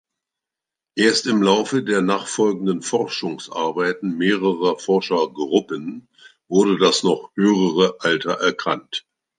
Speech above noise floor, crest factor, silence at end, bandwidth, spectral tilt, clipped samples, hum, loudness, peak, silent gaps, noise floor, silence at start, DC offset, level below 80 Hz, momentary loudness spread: 67 dB; 18 dB; 0.4 s; 9.8 kHz; -4.5 dB/octave; under 0.1%; none; -20 LUFS; -2 dBFS; none; -87 dBFS; 0.95 s; under 0.1%; -70 dBFS; 10 LU